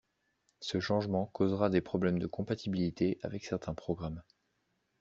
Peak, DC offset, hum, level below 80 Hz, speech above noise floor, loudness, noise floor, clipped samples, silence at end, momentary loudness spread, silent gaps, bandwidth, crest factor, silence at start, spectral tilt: -14 dBFS; under 0.1%; none; -62 dBFS; 46 dB; -34 LUFS; -79 dBFS; under 0.1%; 0.8 s; 8 LU; none; 7.6 kHz; 20 dB; 0.6 s; -6.5 dB/octave